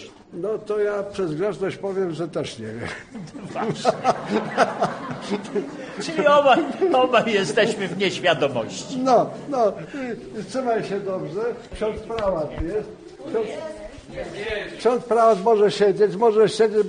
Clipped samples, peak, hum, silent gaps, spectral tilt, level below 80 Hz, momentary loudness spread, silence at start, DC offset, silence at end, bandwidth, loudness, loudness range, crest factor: under 0.1%; -4 dBFS; none; none; -5 dB/octave; -50 dBFS; 15 LU; 0 s; under 0.1%; 0 s; 10 kHz; -22 LUFS; 7 LU; 18 dB